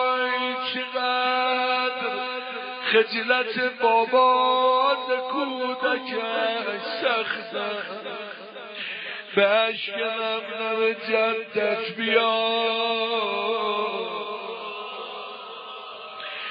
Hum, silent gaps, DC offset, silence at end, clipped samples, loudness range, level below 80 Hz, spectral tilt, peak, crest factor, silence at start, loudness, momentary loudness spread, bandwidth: none; none; under 0.1%; 0 s; under 0.1%; 6 LU; -86 dBFS; -7 dB/octave; -6 dBFS; 20 dB; 0 s; -24 LUFS; 14 LU; 5.2 kHz